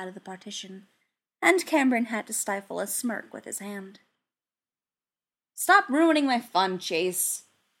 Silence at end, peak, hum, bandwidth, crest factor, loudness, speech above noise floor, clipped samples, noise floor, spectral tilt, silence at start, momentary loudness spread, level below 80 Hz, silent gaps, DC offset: 0.4 s; -6 dBFS; none; 16.5 kHz; 22 dB; -25 LUFS; over 64 dB; under 0.1%; under -90 dBFS; -2.5 dB/octave; 0 s; 17 LU; -84 dBFS; none; under 0.1%